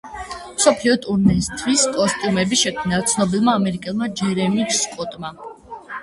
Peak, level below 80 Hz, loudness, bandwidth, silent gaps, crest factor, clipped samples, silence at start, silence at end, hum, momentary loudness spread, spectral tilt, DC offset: 0 dBFS; -44 dBFS; -19 LUFS; 11.5 kHz; none; 20 dB; under 0.1%; 0.05 s; 0 s; none; 15 LU; -4 dB/octave; under 0.1%